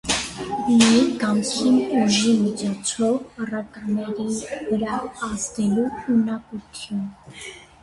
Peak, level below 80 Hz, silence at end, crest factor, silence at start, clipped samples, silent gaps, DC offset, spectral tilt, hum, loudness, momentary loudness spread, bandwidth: -2 dBFS; -52 dBFS; 0.2 s; 20 dB; 0.05 s; under 0.1%; none; under 0.1%; -4 dB/octave; none; -22 LUFS; 14 LU; 11.5 kHz